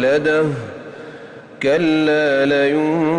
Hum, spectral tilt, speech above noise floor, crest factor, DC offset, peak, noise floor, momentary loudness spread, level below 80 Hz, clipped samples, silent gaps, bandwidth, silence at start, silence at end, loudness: none; -6.5 dB/octave; 21 dB; 10 dB; under 0.1%; -6 dBFS; -37 dBFS; 20 LU; -58 dBFS; under 0.1%; none; 10 kHz; 0 s; 0 s; -16 LUFS